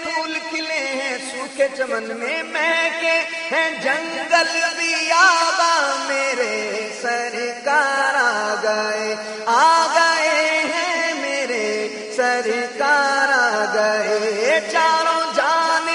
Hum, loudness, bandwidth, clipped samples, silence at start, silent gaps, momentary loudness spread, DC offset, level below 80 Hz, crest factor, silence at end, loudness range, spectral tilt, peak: none; -18 LUFS; 11 kHz; under 0.1%; 0 s; none; 8 LU; under 0.1%; -74 dBFS; 18 dB; 0 s; 3 LU; -1 dB/octave; -2 dBFS